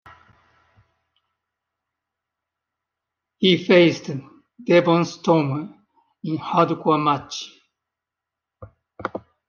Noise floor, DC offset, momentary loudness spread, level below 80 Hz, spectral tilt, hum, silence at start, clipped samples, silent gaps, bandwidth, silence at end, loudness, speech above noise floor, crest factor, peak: -86 dBFS; under 0.1%; 19 LU; -66 dBFS; -6 dB/octave; none; 3.4 s; under 0.1%; none; 7.2 kHz; 0.3 s; -19 LUFS; 67 dB; 20 dB; -2 dBFS